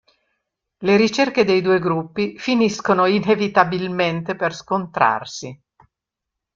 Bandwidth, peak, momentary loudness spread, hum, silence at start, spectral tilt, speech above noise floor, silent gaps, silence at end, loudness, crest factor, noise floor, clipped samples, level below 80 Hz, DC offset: 7.6 kHz; -2 dBFS; 9 LU; none; 0.8 s; -5.5 dB/octave; 65 dB; none; 1 s; -19 LUFS; 18 dB; -83 dBFS; under 0.1%; -60 dBFS; under 0.1%